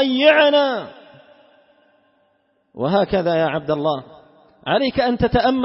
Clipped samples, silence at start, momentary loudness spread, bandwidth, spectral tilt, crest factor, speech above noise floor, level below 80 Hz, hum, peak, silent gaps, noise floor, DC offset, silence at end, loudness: under 0.1%; 0 s; 14 LU; 5.8 kHz; -9.5 dB/octave; 18 dB; 46 dB; -42 dBFS; none; -2 dBFS; none; -64 dBFS; under 0.1%; 0 s; -18 LUFS